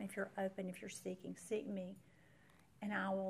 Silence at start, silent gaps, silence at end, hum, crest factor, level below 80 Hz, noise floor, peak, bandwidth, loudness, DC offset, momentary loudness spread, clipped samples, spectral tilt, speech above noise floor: 0 s; none; 0 s; none; 16 dB; -82 dBFS; -68 dBFS; -28 dBFS; 14.5 kHz; -45 LUFS; under 0.1%; 8 LU; under 0.1%; -5.5 dB/octave; 25 dB